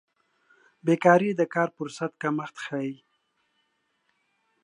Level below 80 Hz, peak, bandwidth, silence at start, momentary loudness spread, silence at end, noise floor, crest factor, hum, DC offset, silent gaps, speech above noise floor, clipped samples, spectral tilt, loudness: -80 dBFS; -4 dBFS; 10.5 kHz; 0.85 s; 13 LU; 1.7 s; -74 dBFS; 24 dB; none; under 0.1%; none; 49 dB; under 0.1%; -6.5 dB/octave; -26 LUFS